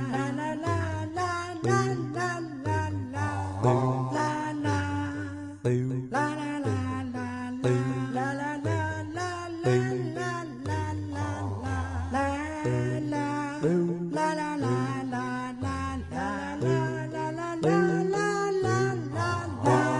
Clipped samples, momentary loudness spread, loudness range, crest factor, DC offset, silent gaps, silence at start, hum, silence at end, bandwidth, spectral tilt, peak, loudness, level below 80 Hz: under 0.1%; 7 LU; 3 LU; 16 dB; under 0.1%; none; 0 s; none; 0 s; 11.5 kHz; -6.5 dB/octave; -12 dBFS; -29 LUFS; -56 dBFS